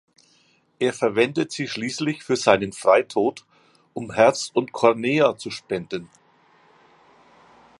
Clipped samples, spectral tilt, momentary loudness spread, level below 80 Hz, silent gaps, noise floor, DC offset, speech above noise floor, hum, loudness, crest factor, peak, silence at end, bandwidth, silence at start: under 0.1%; -4.5 dB/octave; 11 LU; -64 dBFS; none; -61 dBFS; under 0.1%; 40 dB; none; -22 LUFS; 22 dB; 0 dBFS; 1.75 s; 11.5 kHz; 0.8 s